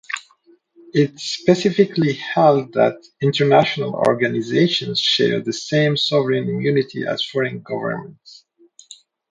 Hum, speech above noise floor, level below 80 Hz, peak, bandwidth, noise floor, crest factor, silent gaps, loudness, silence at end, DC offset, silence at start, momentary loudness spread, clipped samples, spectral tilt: none; 37 dB; -62 dBFS; 0 dBFS; 9.4 kHz; -55 dBFS; 20 dB; none; -18 LUFS; 0.4 s; under 0.1%; 0.1 s; 9 LU; under 0.1%; -5.5 dB/octave